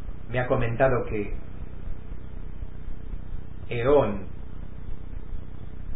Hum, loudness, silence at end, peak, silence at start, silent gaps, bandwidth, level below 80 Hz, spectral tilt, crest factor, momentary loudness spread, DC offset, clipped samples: none; -26 LUFS; 0 s; -8 dBFS; 0 s; none; 4 kHz; -38 dBFS; -11 dB/octave; 20 dB; 19 LU; 3%; under 0.1%